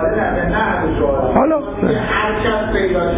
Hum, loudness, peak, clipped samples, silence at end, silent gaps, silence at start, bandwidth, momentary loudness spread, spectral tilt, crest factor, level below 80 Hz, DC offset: none; -16 LUFS; -2 dBFS; under 0.1%; 0 s; none; 0 s; 4 kHz; 3 LU; -10.5 dB/octave; 14 dB; -28 dBFS; under 0.1%